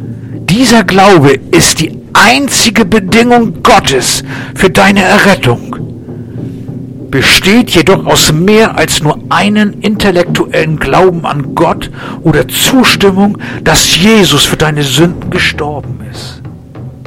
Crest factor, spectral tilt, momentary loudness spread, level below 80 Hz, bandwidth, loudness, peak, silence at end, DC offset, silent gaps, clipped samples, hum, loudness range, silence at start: 8 dB; -4 dB/octave; 17 LU; -30 dBFS; over 20 kHz; -7 LUFS; 0 dBFS; 0 s; 0.4%; none; 1%; none; 3 LU; 0 s